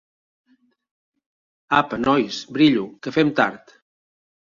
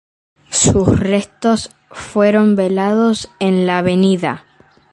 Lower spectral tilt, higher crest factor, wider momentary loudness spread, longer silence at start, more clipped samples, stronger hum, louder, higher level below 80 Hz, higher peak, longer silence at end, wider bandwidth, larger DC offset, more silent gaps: about the same, -5.5 dB/octave vs -5 dB/octave; first, 22 dB vs 16 dB; second, 7 LU vs 10 LU; first, 1.7 s vs 0.5 s; neither; neither; second, -20 LUFS vs -15 LUFS; second, -60 dBFS vs -38 dBFS; about the same, -2 dBFS vs 0 dBFS; first, 0.95 s vs 0.55 s; second, 7.4 kHz vs 11.5 kHz; neither; neither